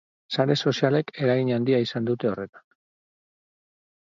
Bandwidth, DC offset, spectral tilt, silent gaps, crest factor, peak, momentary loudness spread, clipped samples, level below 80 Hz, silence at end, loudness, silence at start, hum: 7.6 kHz; under 0.1%; -6.5 dB/octave; 2.49-2.53 s; 20 dB; -6 dBFS; 8 LU; under 0.1%; -68 dBFS; 1.6 s; -24 LUFS; 0.3 s; none